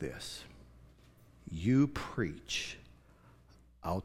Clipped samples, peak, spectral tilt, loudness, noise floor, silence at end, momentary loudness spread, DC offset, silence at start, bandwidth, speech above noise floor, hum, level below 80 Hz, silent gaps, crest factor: under 0.1%; -16 dBFS; -5.5 dB/octave; -35 LUFS; -61 dBFS; 0 s; 21 LU; under 0.1%; 0 s; 15 kHz; 28 dB; none; -56 dBFS; none; 20 dB